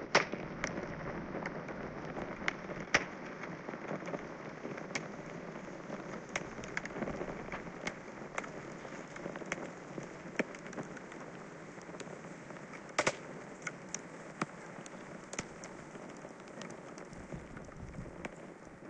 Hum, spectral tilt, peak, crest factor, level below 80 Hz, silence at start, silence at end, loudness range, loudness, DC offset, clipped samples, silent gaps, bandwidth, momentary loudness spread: none; -4 dB/octave; -12 dBFS; 30 dB; -62 dBFS; 0 s; 0 s; 7 LU; -42 LUFS; under 0.1%; under 0.1%; none; 10.5 kHz; 12 LU